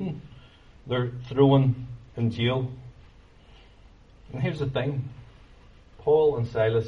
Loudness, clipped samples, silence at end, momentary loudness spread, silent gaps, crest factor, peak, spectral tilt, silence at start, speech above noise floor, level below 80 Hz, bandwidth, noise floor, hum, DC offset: -25 LUFS; under 0.1%; 0 s; 18 LU; none; 20 dB; -6 dBFS; -9 dB/octave; 0 s; 28 dB; -52 dBFS; 6.4 kHz; -52 dBFS; none; under 0.1%